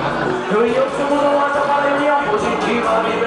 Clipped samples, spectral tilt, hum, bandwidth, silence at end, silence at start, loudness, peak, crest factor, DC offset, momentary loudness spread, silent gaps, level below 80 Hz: under 0.1%; -5 dB/octave; none; 10 kHz; 0 s; 0 s; -17 LUFS; -4 dBFS; 12 dB; under 0.1%; 2 LU; none; -48 dBFS